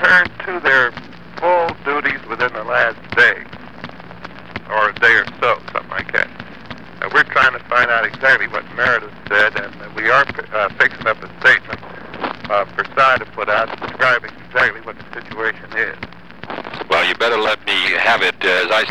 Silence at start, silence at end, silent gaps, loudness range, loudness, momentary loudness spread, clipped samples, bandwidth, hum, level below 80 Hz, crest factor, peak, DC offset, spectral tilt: 0 s; 0 s; none; 4 LU; -16 LUFS; 19 LU; under 0.1%; 13.5 kHz; none; -50 dBFS; 16 dB; -2 dBFS; 1%; -3.5 dB/octave